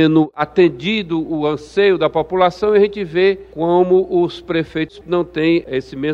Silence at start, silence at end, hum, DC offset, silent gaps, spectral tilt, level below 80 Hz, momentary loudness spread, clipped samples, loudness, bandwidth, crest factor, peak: 0 s; 0 s; none; under 0.1%; none; -7.5 dB/octave; -48 dBFS; 7 LU; under 0.1%; -17 LUFS; 7.4 kHz; 16 dB; 0 dBFS